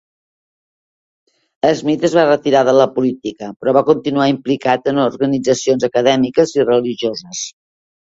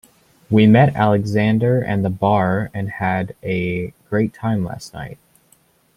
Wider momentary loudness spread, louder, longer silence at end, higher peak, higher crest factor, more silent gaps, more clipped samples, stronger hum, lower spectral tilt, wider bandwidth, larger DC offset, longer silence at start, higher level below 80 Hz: second, 9 LU vs 14 LU; first, -15 LUFS vs -18 LUFS; second, 0.6 s vs 0.8 s; about the same, 0 dBFS vs -2 dBFS; about the same, 16 dB vs 16 dB; first, 3.56-3.60 s vs none; neither; neither; second, -5 dB/octave vs -8 dB/octave; second, 8 kHz vs 12 kHz; neither; first, 1.65 s vs 0.5 s; second, -58 dBFS vs -50 dBFS